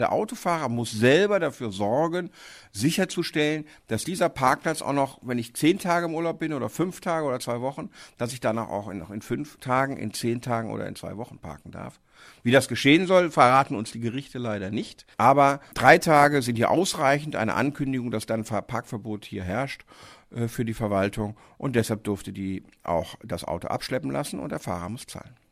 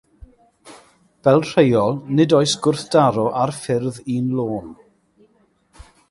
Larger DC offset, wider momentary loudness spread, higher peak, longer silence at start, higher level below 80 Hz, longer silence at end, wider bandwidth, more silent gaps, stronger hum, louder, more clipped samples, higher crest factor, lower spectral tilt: neither; first, 16 LU vs 8 LU; about the same, -2 dBFS vs -2 dBFS; second, 0 s vs 0.65 s; about the same, -56 dBFS vs -54 dBFS; second, 0.25 s vs 1.35 s; first, 15.5 kHz vs 11.5 kHz; neither; neither; second, -25 LUFS vs -18 LUFS; neither; first, 24 dB vs 18 dB; about the same, -5 dB/octave vs -6 dB/octave